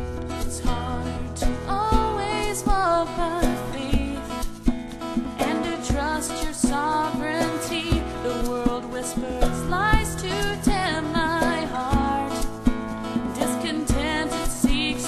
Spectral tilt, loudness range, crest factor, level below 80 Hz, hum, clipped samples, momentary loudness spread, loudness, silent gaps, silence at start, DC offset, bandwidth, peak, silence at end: -4.5 dB/octave; 2 LU; 20 dB; -32 dBFS; none; under 0.1%; 6 LU; -25 LUFS; none; 0 s; under 0.1%; 14 kHz; -4 dBFS; 0 s